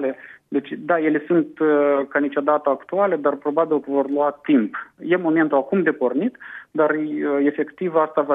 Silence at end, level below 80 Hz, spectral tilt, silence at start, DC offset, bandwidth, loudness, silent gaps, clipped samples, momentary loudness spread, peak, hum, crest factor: 0 s; -76 dBFS; -9.5 dB/octave; 0 s; under 0.1%; 3.9 kHz; -21 LUFS; none; under 0.1%; 9 LU; -4 dBFS; none; 16 dB